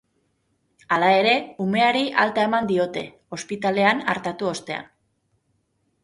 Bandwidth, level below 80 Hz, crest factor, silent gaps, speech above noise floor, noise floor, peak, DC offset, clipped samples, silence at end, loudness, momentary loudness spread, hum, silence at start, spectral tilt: 11.5 kHz; -64 dBFS; 22 dB; none; 48 dB; -70 dBFS; -2 dBFS; under 0.1%; under 0.1%; 1.2 s; -21 LUFS; 14 LU; none; 0.9 s; -4.5 dB/octave